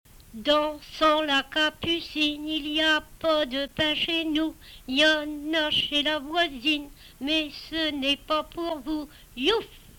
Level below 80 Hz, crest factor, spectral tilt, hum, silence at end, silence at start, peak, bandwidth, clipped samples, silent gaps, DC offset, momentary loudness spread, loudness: -52 dBFS; 16 dB; -3 dB/octave; none; 0.2 s; 0.15 s; -10 dBFS; 19 kHz; under 0.1%; none; under 0.1%; 10 LU; -25 LUFS